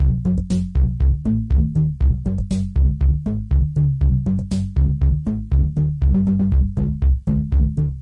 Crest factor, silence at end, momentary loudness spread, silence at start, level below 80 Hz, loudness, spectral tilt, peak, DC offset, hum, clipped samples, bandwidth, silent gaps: 10 dB; 0 s; 4 LU; 0 s; -20 dBFS; -20 LUFS; -9.5 dB/octave; -6 dBFS; under 0.1%; none; under 0.1%; 8.2 kHz; none